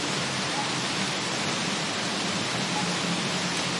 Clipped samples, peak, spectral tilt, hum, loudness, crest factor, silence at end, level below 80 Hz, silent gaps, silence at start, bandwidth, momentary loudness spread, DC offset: under 0.1%; -14 dBFS; -2.5 dB/octave; none; -26 LUFS; 14 dB; 0 s; -66 dBFS; none; 0 s; 11.5 kHz; 1 LU; under 0.1%